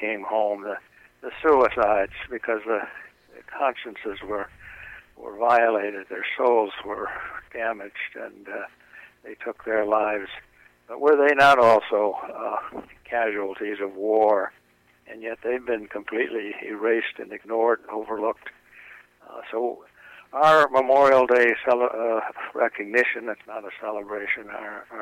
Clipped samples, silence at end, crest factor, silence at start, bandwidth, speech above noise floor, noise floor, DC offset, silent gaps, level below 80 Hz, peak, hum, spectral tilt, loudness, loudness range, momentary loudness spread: under 0.1%; 0 s; 16 dB; 0 s; 14 kHz; 25 dB; -49 dBFS; under 0.1%; none; -60 dBFS; -8 dBFS; none; -5 dB/octave; -23 LUFS; 9 LU; 20 LU